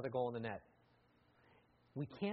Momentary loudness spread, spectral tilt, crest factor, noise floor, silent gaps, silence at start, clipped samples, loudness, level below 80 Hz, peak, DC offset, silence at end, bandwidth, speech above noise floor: 12 LU; -6 dB/octave; 18 dB; -73 dBFS; none; 0 s; under 0.1%; -45 LUFS; -78 dBFS; -26 dBFS; under 0.1%; 0 s; 5.4 kHz; 31 dB